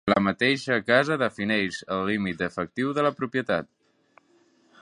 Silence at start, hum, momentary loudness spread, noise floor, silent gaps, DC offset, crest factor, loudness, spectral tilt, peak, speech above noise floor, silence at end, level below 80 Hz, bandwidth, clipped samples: 0.05 s; none; 7 LU; -62 dBFS; none; under 0.1%; 22 dB; -25 LUFS; -5.5 dB/octave; -4 dBFS; 37 dB; 1.2 s; -60 dBFS; 11 kHz; under 0.1%